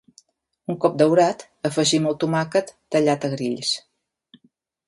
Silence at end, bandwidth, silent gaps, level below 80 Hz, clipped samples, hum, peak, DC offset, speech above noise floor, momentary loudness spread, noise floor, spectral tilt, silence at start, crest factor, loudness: 1.1 s; 11.5 kHz; none; -68 dBFS; under 0.1%; none; -4 dBFS; under 0.1%; 43 dB; 10 LU; -64 dBFS; -4.5 dB/octave; 0.7 s; 20 dB; -21 LUFS